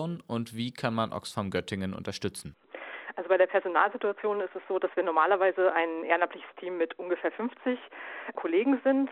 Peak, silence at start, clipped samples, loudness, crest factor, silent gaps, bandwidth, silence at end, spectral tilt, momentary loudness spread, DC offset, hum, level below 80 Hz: -8 dBFS; 0 s; under 0.1%; -29 LUFS; 22 dB; none; 13.5 kHz; 0 s; -5.5 dB/octave; 14 LU; under 0.1%; none; -68 dBFS